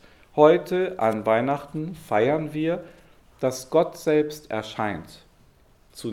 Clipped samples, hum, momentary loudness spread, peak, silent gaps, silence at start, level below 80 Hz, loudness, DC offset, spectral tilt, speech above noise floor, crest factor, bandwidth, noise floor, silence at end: under 0.1%; none; 14 LU; -2 dBFS; none; 0.35 s; -58 dBFS; -24 LUFS; under 0.1%; -6 dB/octave; 33 dB; 22 dB; 16 kHz; -56 dBFS; 0 s